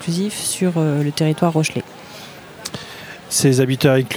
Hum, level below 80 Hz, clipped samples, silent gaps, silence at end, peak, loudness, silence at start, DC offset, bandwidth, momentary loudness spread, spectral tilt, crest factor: none; -60 dBFS; under 0.1%; none; 0 s; -2 dBFS; -18 LUFS; 0 s; under 0.1%; over 20 kHz; 19 LU; -5 dB/octave; 18 dB